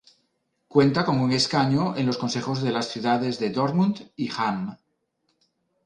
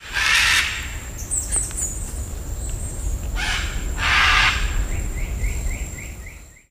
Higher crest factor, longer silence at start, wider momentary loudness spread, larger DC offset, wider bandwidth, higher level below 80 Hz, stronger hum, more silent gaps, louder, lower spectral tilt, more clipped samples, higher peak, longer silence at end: about the same, 20 dB vs 20 dB; first, 0.75 s vs 0 s; second, 6 LU vs 16 LU; neither; second, 10.5 kHz vs 15.5 kHz; second, -62 dBFS vs -28 dBFS; neither; neither; second, -24 LUFS vs -21 LUFS; first, -6 dB/octave vs -1.5 dB/octave; neither; about the same, -4 dBFS vs -2 dBFS; first, 1.1 s vs 0.2 s